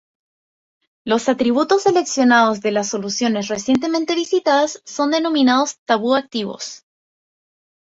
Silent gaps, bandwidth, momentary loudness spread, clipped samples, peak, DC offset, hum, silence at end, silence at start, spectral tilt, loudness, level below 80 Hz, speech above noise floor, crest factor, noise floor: 5.79-5.86 s; 8 kHz; 8 LU; under 0.1%; -2 dBFS; under 0.1%; none; 1.05 s; 1.05 s; -3.5 dB/octave; -18 LUFS; -62 dBFS; over 73 dB; 16 dB; under -90 dBFS